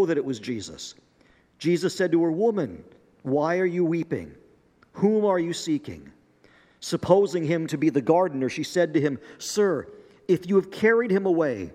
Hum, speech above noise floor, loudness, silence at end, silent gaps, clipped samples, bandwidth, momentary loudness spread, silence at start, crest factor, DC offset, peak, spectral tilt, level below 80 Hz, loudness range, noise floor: none; 36 dB; -24 LUFS; 0 s; none; under 0.1%; 15 kHz; 16 LU; 0 s; 20 dB; under 0.1%; -4 dBFS; -6 dB/octave; -66 dBFS; 3 LU; -60 dBFS